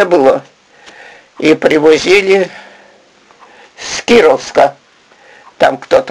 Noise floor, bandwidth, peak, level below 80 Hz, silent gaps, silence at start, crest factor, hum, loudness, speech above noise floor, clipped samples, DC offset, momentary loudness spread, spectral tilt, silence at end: -45 dBFS; 11.5 kHz; 0 dBFS; -48 dBFS; none; 0 s; 12 dB; none; -10 LUFS; 36 dB; 0.3%; under 0.1%; 11 LU; -4 dB/octave; 0 s